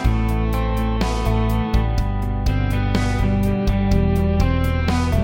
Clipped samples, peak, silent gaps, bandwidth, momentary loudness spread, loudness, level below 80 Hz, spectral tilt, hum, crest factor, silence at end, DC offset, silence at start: under 0.1%; -6 dBFS; none; 17 kHz; 3 LU; -20 LUFS; -22 dBFS; -7 dB/octave; none; 12 dB; 0 s; under 0.1%; 0 s